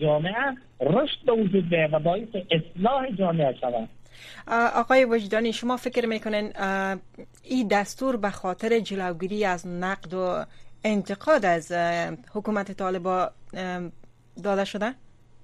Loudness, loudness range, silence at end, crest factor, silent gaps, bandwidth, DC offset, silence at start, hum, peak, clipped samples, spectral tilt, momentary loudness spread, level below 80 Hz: -26 LUFS; 4 LU; 0 s; 18 dB; none; 13.5 kHz; under 0.1%; 0 s; none; -8 dBFS; under 0.1%; -6 dB/octave; 10 LU; -54 dBFS